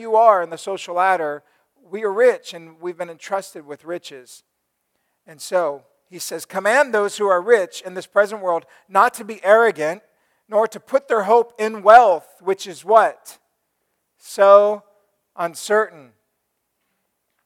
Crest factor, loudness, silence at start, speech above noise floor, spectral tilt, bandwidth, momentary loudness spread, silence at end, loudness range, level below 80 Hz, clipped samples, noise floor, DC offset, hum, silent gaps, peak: 20 dB; -18 LUFS; 0 s; 56 dB; -3.5 dB/octave; 16 kHz; 19 LU; 1.55 s; 10 LU; -70 dBFS; under 0.1%; -74 dBFS; under 0.1%; none; none; 0 dBFS